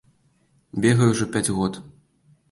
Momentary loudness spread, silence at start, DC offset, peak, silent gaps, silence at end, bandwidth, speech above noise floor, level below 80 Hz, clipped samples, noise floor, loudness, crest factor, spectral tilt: 14 LU; 0.75 s; under 0.1%; -6 dBFS; none; 0.65 s; 12 kHz; 42 dB; -52 dBFS; under 0.1%; -63 dBFS; -21 LUFS; 18 dB; -5.5 dB/octave